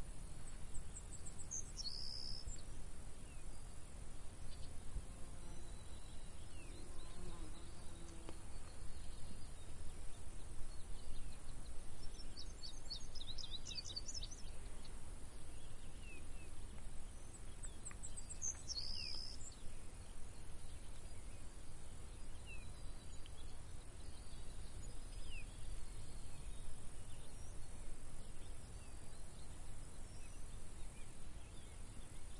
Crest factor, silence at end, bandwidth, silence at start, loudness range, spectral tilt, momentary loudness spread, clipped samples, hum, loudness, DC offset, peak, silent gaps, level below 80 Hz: 14 dB; 0 s; 11.5 kHz; 0 s; 8 LU; -3 dB/octave; 10 LU; under 0.1%; none; -53 LUFS; under 0.1%; -28 dBFS; none; -52 dBFS